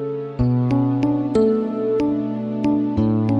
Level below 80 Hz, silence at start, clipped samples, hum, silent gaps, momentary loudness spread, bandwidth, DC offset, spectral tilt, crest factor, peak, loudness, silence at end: -40 dBFS; 0 s; under 0.1%; none; none; 5 LU; 8.4 kHz; under 0.1%; -10 dB/octave; 12 dB; -6 dBFS; -20 LUFS; 0 s